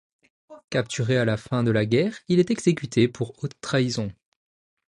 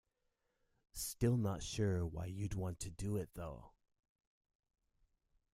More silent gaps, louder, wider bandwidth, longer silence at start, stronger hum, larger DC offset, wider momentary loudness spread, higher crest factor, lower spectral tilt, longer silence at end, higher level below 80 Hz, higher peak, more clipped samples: first, 0.64-0.68 s vs none; first, -24 LUFS vs -41 LUFS; second, 11 kHz vs 16 kHz; second, 0.5 s vs 0.95 s; neither; neither; second, 9 LU vs 14 LU; about the same, 18 dB vs 20 dB; about the same, -6 dB/octave vs -6 dB/octave; second, 0.75 s vs 1.85 s; about the same, -58 dBFS vs -58 dBFS; first, -6 dBFS vs -22 dBFS; neither